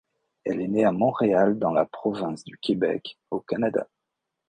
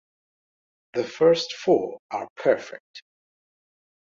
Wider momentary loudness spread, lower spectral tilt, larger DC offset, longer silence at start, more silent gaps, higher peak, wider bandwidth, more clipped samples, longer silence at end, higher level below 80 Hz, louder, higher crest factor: about the same, 11 LU vs 13 LU; first, -7.5 dB/octave vs -5 dB/octave; neither; second, 0.45 s vs 0.95 s; second, none vs 1.99-2.09 s, 2.30-2.36 s, 2.80-2.94 s; about the same, -6 dBFS vs -6 dBFS; first, 9.6 kHz vs 7.4 kHz; neither; second, 0.65 s vs 1.05 s; first, -62 dBFS vs -70 dBFS; about the same, -25 LUFS vs -24 LUFS; about the same, 18 dB vs 20 dB